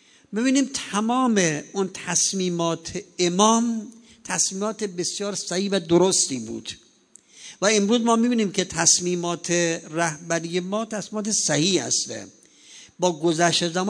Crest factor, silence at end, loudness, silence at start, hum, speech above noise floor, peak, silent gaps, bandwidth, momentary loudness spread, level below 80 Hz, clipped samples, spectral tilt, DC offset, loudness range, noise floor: 22 dB; 0 s; -22 LUFS; 0.3 s; none; 32 dB; -2 dBFS; none; 10 kHz; 12 LU; -64 dBFS; under 0.1%; -3 dB/octave; under 0.1%; 3 LU; -55 dBFS